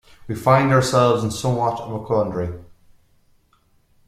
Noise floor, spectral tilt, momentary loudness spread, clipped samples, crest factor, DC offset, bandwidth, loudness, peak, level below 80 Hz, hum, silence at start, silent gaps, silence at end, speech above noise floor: -60 dBFS; -6 dB/octave; 14 LU; under 0.1%; 20 dB; under 0.1%; 14.5 kHz; -19 LUFS; -2 dBFS; -50 dBFS; none; 0.2 s; none; 1.45 s; 41 dB